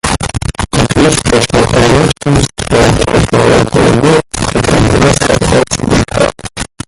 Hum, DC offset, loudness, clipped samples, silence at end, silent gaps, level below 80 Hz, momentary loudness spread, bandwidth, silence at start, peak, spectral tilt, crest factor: none; under 0.1%; -9 LUFS; under 0.1%; 0.2 s; none; -22 dBFS; 6 LU; 16 kHz; 0.05 s; 0 dBFS; -5 dB/octave; 10 dB